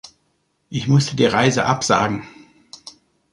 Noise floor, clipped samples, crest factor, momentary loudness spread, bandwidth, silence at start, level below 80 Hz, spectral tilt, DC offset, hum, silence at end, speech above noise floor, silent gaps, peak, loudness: -67 dBFS; under 0.1%; 20 dB; 23 LU; 11.5 kHz; 0.7 s; -52 dBFS; -5 dB/octave; under 0.1%; none; 0.45 s; 50 dB; none; -2 dBFS; -18 LUFS